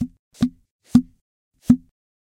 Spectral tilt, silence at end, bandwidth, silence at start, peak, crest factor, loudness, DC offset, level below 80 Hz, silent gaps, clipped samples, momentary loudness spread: -7.5 dB/octave; 0.5 s; 11 kHz; 0 s; -2 dBFS; 22 dB; -21 LUFS; under 0.1%; -48 dBFS; 0.19-0.31 s, 0.71-0.79 s, 1.21-1.51 s; under 0.1%; 16 LU